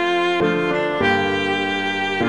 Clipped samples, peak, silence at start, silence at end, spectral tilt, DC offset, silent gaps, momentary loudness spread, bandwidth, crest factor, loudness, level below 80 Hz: under 0.1%; -6 dBFS; 0 s; 0 s; -5 dB/octave; 0.4%; none; 3 LU; 11 kHz; 12 dB; -19 LUFS; -52 dBFS